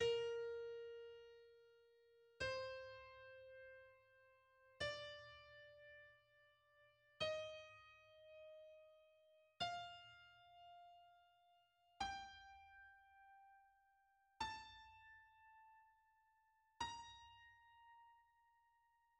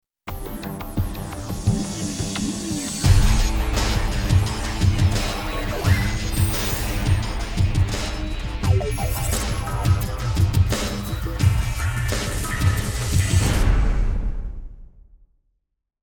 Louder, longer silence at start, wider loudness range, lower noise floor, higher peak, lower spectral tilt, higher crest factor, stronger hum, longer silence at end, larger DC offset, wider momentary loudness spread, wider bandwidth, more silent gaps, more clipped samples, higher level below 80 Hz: second, -51 LUFS vs -23 LUFS; second, 0 s vs 0.25 s; first, 6 LU vs 2 LU; first, -80 dBFS vs -71 dBFS; second, -32 dBFS vs -2 dBFS; second, -2.5 dB/octave vs -5 dB/octave; about the same, 22 dB vs 18 dB; neither; second, 0.95 s vs 1.15 s; neither; first, 21 LU vs 9 LU; second, 9.6 kHz vs over 20 kHz; neither; neither; second, -78 dBFS vs -26 dBFS